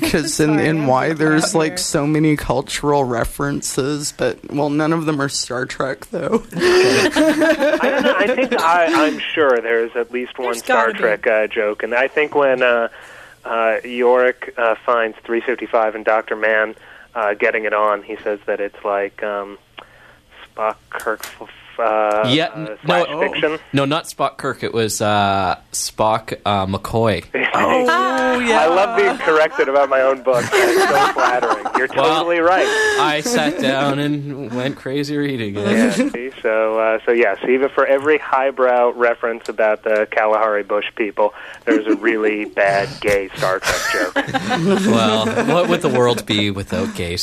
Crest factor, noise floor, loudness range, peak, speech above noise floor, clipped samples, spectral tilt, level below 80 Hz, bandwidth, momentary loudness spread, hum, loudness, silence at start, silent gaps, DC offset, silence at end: 16 dB; -47 dBFS; 5 LU; -2 dBFS; 30 dB; under 0.1%; -4.5 dB/octave; -46 dBFS; 14 kHz; 8 LU; none; -17 LUFS; 0 s; none; under 0.1%; 0 s